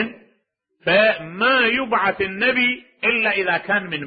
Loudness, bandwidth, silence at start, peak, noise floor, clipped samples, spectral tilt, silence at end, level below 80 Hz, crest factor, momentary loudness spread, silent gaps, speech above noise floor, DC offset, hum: -18 LUFS; 5 kHz; 0 s; -4 dBFS; -68 dBFS; under 0.1%; -9 dB/octave; 0 s; -58 dBFS; 16 dB; 6 LU; none; 49 dB; under 0.1%; none